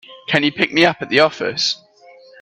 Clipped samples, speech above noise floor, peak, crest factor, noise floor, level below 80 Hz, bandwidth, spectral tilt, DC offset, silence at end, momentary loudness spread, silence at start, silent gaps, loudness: under 0.1%; 29 dB; 0 dBFS; 18 dB; -46 dBFS; -60 dBFS; 11 kHz; -4 dB/octave; under 0.1%; 0.65 s; 5 LU; 0.1 s; none; -16 LUFS